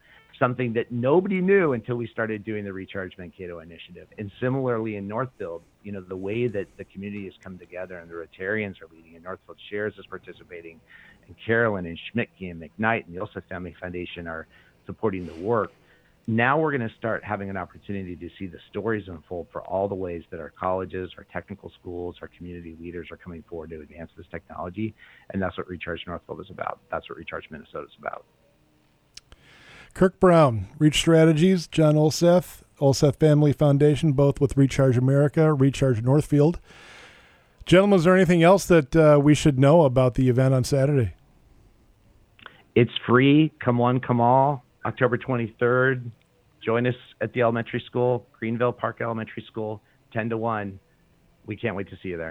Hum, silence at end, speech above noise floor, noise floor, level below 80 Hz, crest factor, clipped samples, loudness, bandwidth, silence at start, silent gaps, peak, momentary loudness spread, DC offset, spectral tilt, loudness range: none; 0 s; 39 dB; -63 dBFS; -50 dBFS; 18 dB; under 0.1%; -23 LUFS; 15 kHz; 0.4 s; none; -6 dBFS; 21 LU; under 0.1%; -7 dB/octave; 15 LU